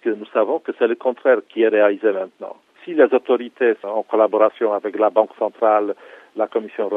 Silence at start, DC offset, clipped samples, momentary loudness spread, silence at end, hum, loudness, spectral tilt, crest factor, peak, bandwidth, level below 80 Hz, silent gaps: 0.05 s; under 0.1%; under 0.1%; 11 LU; 0 s; none; -19 LUFS; -7 dB/octave; 18 dB; -2 dBFS; 3.9 kHz; -76 dBFS; none